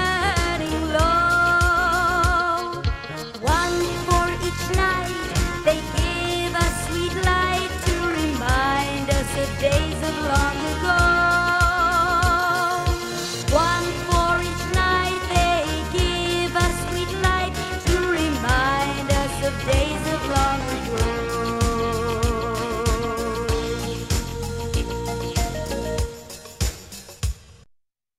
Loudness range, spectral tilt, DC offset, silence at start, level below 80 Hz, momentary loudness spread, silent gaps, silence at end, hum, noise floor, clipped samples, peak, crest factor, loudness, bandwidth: 6 LU; -4.5 dB/octave; under 0.1%; 0 s; -30 dBFS; 8 LU; none; 0.65 s; none; -63 dBFS; under 0.1%; -4 dBFS; 16 dB; -22 LUFS; 16 kHz